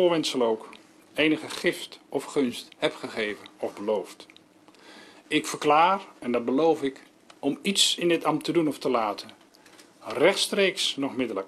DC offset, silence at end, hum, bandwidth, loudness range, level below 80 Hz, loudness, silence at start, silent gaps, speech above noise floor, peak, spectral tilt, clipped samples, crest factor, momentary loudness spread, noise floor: under 0.1%; 0 s; none; 14 kHz; 7 LU; -70 dBFS; -26 LUFS; 0 s; none; 29 dB; -6 dBFS; -3 dB/octave; under 0.1%; 20 dB; 13 LU; -55 dBFS